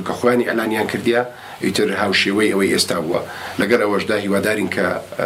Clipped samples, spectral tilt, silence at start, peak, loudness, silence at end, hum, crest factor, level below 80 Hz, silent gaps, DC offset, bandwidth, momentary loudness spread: under 0.1%; -4 dB/octave; 0 s; -2 dBFS; -18 LUFS; 0 s; none; 18 dB; -58 dBFS; none; under 0.1%; 16 kHz; 6 LU